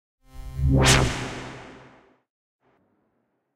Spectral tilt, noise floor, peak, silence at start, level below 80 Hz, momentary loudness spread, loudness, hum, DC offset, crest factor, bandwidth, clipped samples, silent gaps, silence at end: -4 dB/octave; -73 dBFS; -4 dBFS; 0.35 s; -34 dBFS; 24 LU; -21 LUFS; none; under 0.1%; 22 dB; 15.5 kHz; under 0.1%; none; 1.75 s